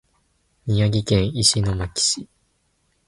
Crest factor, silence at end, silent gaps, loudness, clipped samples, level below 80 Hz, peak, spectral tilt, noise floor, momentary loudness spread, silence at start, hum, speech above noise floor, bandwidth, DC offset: 20 dB; 0.85 s; none; -20 LUFS; under 0.1%; -40 dBFS; -2 dBFS; -4 dB/octave; -67 dBFS; 8 LU; 0.65 s; none; 47 dB; 11.5 kHz; under 0.1%